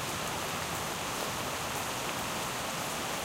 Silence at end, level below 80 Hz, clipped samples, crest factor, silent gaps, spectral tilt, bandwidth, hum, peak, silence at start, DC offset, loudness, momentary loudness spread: 0 s; -56 dBFS; under 0.1%; 16 dB; none; -2.5 dB/octave; 17 kHz; none; -18 dBFS; 0 s; under 0.1%; -34 LUFS; 0 LU